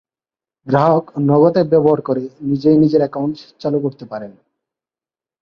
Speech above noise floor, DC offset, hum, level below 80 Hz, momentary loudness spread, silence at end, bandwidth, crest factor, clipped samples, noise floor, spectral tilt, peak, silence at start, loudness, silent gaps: over 75 dB; under 0.1%; none; -56 dBFS; 14 LU; 1.1 s; 6.4 kHz; 16 dB; under 0.1%; under -90 dBFS; -10 dB/octave; -2 dBFS; 0.65 s; -16 LUFS; none